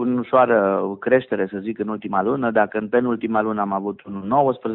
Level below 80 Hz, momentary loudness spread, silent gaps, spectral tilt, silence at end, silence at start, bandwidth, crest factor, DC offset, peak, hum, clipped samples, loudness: -62 dBFS; 9 LU; none; -6 dB/octave; 0 s; 0 s; 4.1 kHz; 16 dB; under 0.1%; -4 dBFS; none; under 0.1%; -21 LUFS